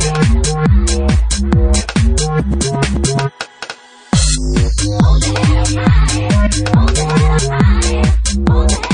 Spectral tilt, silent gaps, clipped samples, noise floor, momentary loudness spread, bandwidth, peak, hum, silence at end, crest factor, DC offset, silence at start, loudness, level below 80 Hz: -5 dB/octave; none; under 0.1%; -32 dBFS; 4 LU; 10.5 kHz; 0 dBFS; none; 0 s; 12 dB; under 0.1%; 0 s; -13 LUFS; -16 dBFS